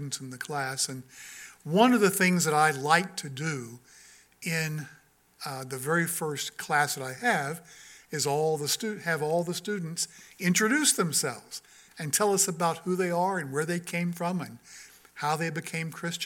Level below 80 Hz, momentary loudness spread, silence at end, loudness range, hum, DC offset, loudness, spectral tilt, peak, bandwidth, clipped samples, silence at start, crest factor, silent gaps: -74 dBFS; 18 LU; 0 s; 6 LU; none; under 0.1%; -28 LUFS; -3.5 dB/octave; -6 dBFS; 17.5 kHz; under 0.1%; 0 s; 24 dB; none